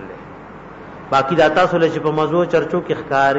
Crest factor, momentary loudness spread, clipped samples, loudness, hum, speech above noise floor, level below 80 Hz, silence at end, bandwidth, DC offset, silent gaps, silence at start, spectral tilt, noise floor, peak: 14 dB; 22 LU; under 0.1%; -17 LUFS; none; 20 dB; -50 dBFS; 0 s; 8 kHz; under 0.1%; none; 0 s; -6.5 dB/octave; -36 dBFS; -4 dBFS